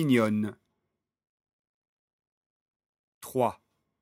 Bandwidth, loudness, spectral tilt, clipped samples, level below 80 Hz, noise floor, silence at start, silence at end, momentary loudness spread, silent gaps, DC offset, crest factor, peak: 16.5 kHz; -29 LUFS; -6.5 dB/octave; under 0.1%; -76 dBFS; -83 dBFS; 0 s; 0.45 s; 12 LU; 1.29-1.38 s, 1.53-1.82 s, 1.88-2.19 s, 2.27-2.80 s, 2.86-2.93 s, 2.99-3.21 s; under 0.1%; 22 dB; -10 dBFS